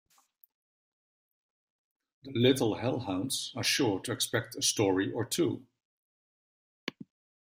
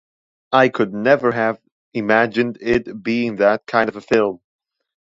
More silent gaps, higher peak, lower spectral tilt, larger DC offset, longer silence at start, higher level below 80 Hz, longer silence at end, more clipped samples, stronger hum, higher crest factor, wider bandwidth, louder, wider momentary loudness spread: first, 5.85-6.87 s vs 1.72-1.92 s; second, -12 dBFS vs 0 dBFS; second, -4 dB/octave vs -6.5 dB/octave; neither; first, 2.25 s vs 0.5 s; second, -70 dBFS vs -54 dBFS; second, 0.45 s vs 0.65 s; neither; neither; about the same, 20 dB vs 18 dB; first, 16 kHz vs 7.6 kHz; second, -30 LUFS vs -18 LUFS; first, 16 LU vs 7 LU